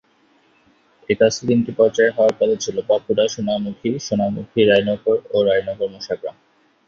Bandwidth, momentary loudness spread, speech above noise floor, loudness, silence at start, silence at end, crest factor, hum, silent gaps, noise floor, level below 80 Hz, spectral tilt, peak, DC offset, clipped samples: 7.6 kHz; 10 LU; 40 dB; -19 LUFS; 1.1 s; 0.55 s; 18 dB; none; none; -58 dBFS; -56 dBFS; -5 dB/octave; -2 dBFS; under 0.1%; under 0.1%